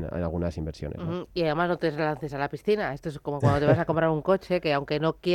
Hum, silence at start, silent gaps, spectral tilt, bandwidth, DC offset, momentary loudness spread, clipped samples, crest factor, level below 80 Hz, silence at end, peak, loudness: none; 0 s; none; -7.5 dB/octave; 14 kHz; under 0.1%; 10 LU; under 0.1%; 18 dB; -48 dBFS; 0 s; -8 dBFS; -27 LUFS